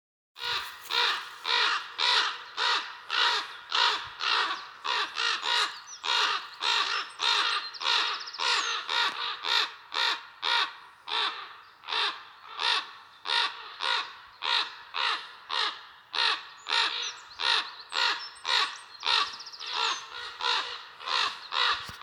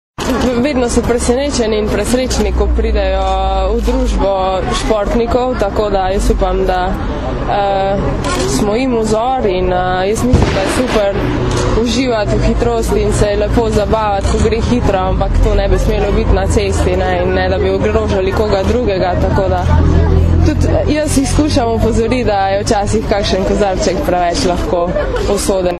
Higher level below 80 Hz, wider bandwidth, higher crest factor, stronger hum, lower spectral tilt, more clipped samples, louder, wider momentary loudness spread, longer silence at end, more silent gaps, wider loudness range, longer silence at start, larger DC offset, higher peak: second, -76 dBFS vs -18 dBFS; first, over 20 kHz vs 13.5 kHz; first, 20 dB vs 12 dB; neither; second, 1.5 dB/octave vs -6 dB/octave; neither; second, -28 LUFS vs -14 LUFS; first, 9 LU vs 3 LU; about the same, 0 s vs 0 s; neither; about the same, 3 LU vs 2 LU; first, 0.35 s vs 0.2 s; neither; second, -10 dBFS vs 0 dBFS